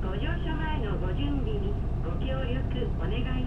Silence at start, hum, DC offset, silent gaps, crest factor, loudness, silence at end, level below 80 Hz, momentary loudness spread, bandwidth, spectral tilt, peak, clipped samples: 0 s; none; under 0.1%; none; 12 dB; -31 LUFS; 0 s; -30 dBFS; 2 LU; 4.6 kHz; -8.5 dB/octave; -16 dBFS; under 0.1%